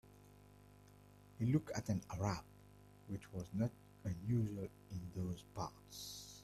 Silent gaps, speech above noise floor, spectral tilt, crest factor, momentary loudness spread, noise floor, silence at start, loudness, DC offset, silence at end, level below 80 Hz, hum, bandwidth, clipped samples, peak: none; 21 dB; -6.5 dB/octave; 20 dB; 25 LU; -63 dBFS; 0.05 s; -43 LUFS; under 0.1%; 0 s; -66 dBFS; 50 Hz at -55 dBFS; 14.5 kHz; under 0.1%; -24 dBFS